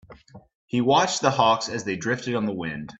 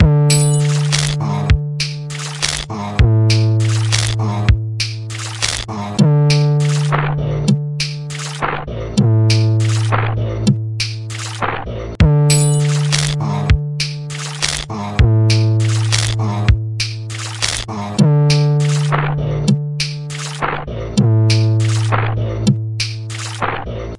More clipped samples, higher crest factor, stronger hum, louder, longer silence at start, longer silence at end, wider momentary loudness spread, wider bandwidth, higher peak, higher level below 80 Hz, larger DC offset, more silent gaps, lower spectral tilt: neither; about the same, 20 dB vs 16 dB; neither; second, -23 LUFS vs -16 LUFS; about the same, 0.1 s vs 0 s; about the same, 0.05 s vs 0 s; about the same, 9 LU vs 9 LU; second, 8.4 kHz vs 11.5 kHz; second, -4 dBFS vs 0 dBFS; second, -60 dBFS vs -28 dBFS; neither; first, 0.55-0.68 s vs none; about the same, -4 dB/octave vs -5 dB/octave